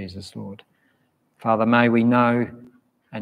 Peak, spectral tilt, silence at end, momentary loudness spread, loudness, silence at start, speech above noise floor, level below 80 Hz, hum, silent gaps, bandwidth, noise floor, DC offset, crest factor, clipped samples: -4 dBFS; -7.5 dB/octave; 0 s; 20 LU; -19 LUFS; 0 s; 46 dB; -66 dBFS; none; none; 9.8 kHz; -67 dBFS; under 0.1%; 18 dB; under 0.1%